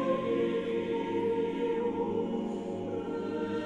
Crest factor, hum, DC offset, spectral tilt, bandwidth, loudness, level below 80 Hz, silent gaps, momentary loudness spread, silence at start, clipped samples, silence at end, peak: 14 dB; none; under 0.1%; -7.5 dB/octave; 8.4 kHz; -32 LUFS; -64 dBFS; none; 5 LU; 0 s; under 0.1%; 0 s; -16 dBFS